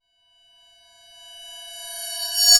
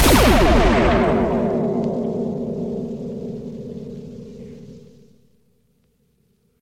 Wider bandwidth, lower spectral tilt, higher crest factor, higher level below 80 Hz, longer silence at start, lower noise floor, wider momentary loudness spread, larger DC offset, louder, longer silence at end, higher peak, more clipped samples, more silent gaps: about the same, 19.5 kHz vs 18 kHz; second, 6 dB/octave vs -5.5 dB/octave; first, 24 dB vs 18 dB; second, -70 dBFS vs -28 dBFS; first, 1.3 s vs 0 s; about the same, -61 dBFS vs -63 dBFS; about the same, 22 LU vs 23 LU; neither; second, -26 LUFS vs -19 LUFS; second, 0 s vs 1.8 s; about the same, 0 dBFS vs -2 dBFS; neither; neither